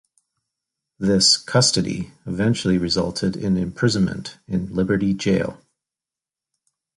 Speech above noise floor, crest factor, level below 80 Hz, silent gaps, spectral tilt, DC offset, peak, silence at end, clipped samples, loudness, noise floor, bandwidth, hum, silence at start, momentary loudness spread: 69 dB; 18 dB; -46 dBFS; none; -4.5 dB/octave; under 0.1%; -4 dBFS; 1.4 s; under 0.1%; -20 LUFS; -89 dBFS; 11.5 kHz; none; 1 s; 12 LU